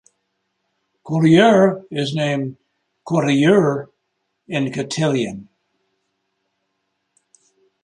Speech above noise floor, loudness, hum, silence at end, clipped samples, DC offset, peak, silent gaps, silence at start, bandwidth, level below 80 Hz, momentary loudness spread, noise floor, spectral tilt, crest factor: 57 dB; -17 LUFS; none; 2.4 s; under 0.1%; under 0.1%; -2 dBFS; none; 1.05 s; 10.5 kHz; -62 dBFS; 15 LU; -73 dBFS; -6 dB/octave; 18 dB